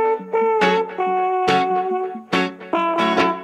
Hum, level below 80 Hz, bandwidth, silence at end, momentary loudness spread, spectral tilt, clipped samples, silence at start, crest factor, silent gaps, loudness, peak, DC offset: none; -62 dBFS; 11 kHz; 0 s; 5 LU; -5.5 dB/octave; under 0.1%; 0 s; 14 dB; none; -19 LUFS; -4 dBFS; under 0.1%